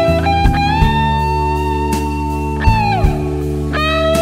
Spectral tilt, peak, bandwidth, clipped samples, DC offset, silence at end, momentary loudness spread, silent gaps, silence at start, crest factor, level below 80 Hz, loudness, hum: -6.5 dB/octave; 0 dBFS; 15.5 kHz; under 0.1%; under 0.1%; 0 s; 6 LU; none; 0 s; 14 dB; -20 dBFS; -15 LUFS; none